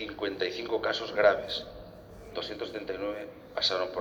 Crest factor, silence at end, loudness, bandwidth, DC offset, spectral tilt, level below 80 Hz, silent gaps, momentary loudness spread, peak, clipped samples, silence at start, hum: 24 dB; 0 s; -31 LUFS; 20 kHz; under 0.1%; -3.5 dB/octave; -58 dBFS; none; 18 LU; -8 dBFS; under 0.1%; 0 s; none